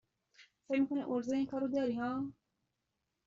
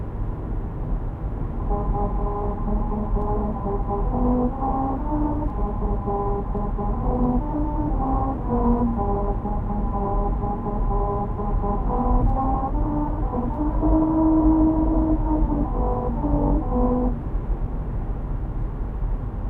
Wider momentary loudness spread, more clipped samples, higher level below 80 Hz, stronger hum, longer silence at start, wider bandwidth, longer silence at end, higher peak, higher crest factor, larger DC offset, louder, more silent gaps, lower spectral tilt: second, 5 LU vs 9 LU; neither; second, -74 dBFS vs -26 dBFS; neither; first, 0.4 s vs 0 s; first, 7.4 kHz vs 2.8 kHz; first, 0.95 s vs 0 s; second, -22 dBFS vs -6 dBFS; about the same, 16 dB vs 16 dB; neither; second, -36 LUFS vs -24 LUFS; neither; second, -5.5 dB/octave vs -12 dB/octave